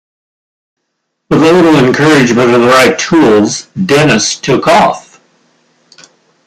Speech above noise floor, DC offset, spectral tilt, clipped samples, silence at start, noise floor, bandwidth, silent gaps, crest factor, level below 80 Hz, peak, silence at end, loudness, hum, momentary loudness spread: 61 dB; under 0.1%; -4.5 dB/octave; under 0.1%; 1.3 s; -68 dBFS; 15.5 kHz; none; 10 dB; -46 dBFS; 0 dBFS; 1.45 s; -8 LUFS; none; 7 LU